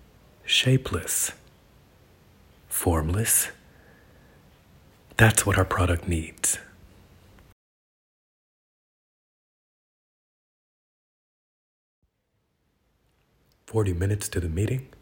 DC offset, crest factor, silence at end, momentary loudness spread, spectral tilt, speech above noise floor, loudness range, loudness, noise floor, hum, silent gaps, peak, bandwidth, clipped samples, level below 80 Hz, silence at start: under 0.1%; 28 dB; 0.15 s; 10 LU; -3.5 dB/octave; 50 dB; 9 LU; -24 LUFS; -74 dBFS; none; 7.52-12.02 s; -2 dBFS; 16.5 kHz; under 0.1%; -44 dBFS; 0.45 s